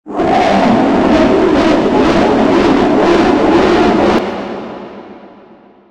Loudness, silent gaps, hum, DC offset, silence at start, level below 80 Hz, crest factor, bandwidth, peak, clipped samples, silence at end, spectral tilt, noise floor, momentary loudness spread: -10 LUFS; none; none; under 0.1%; 0.05 s; -34 dBFS; 10 dB; 9.8 kHz; 0 dBFS; under 0.1%; 0.65 s; -6 dB/octave; -41 dBFS; 13 LU